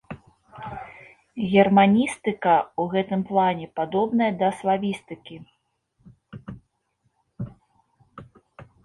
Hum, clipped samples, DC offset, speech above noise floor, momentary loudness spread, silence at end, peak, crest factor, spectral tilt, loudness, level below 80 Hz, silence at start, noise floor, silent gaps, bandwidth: none; under 0.1%; under 0.1%; 50 dB; 25 LU; 0.2 s; -4 dBFS; 22 dB; -6.5 dB/octave; -22 LUFS; -60 dBFS; 0.1 s; -71 dBFS; none; 11.5 kHz